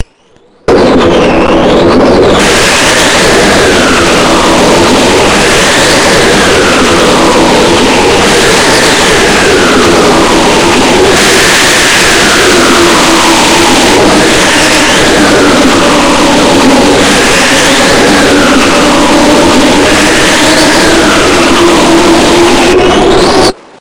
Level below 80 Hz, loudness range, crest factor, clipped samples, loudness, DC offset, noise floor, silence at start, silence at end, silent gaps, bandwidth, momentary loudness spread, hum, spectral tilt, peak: -24 dBFS; 1 LU; 4 dB; 7%; -4 LUFS; 2%; -43 dBFS; 0 s; 0.05 s; none; over 20 kHz; 1 LU; none; -3 dB/octave; 0 dBFS